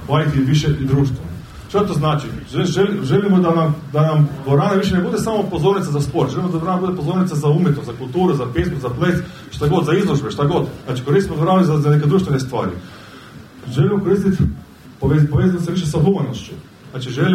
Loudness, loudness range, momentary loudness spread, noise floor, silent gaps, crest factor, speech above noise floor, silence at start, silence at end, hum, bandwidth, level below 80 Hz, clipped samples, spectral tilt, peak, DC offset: -17 LUFS; 2 LU; 11 LU; -38 dBFS; none; 14 dB; 22 dB; 0 s; 0 s; none; 13.5 kHz; -38 dBFS; under 0.1%; -7.5 dB/octave; -2 dBFS; under 0.1%